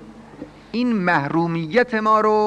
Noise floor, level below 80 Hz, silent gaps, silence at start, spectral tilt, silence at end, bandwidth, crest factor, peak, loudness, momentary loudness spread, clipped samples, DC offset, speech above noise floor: -39 dBFS; -56 dBFS; none; 0 s; -7 dB/octave; 0 s; 9.6 kHz; 14 dB; -4 dBFS; -19 LUFS; 22 LU; under 0.1%; under 0.1%; 21 dB